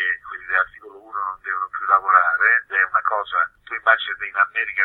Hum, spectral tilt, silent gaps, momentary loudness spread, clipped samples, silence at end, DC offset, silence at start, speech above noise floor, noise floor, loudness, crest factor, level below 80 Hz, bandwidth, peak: none; -3 dB/octave; none; 12 LU; under 0.1%; 0 s; under 0.1%; 0 s; 20 dB; -41 dBFS; -19 LUFS; 20 dB; -62 dBFS; 4.2 kHz; -2 dBFS